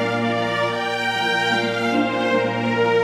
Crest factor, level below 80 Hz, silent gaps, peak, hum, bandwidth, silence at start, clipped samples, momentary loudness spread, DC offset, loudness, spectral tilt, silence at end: 12 dB; -60 dBFS; none; -8 dBFS; none; 15 kHz; 0 s; under 0.1%; 3 LU; under 0.1%; -20 LUFS; -5 dB/octave; 0 s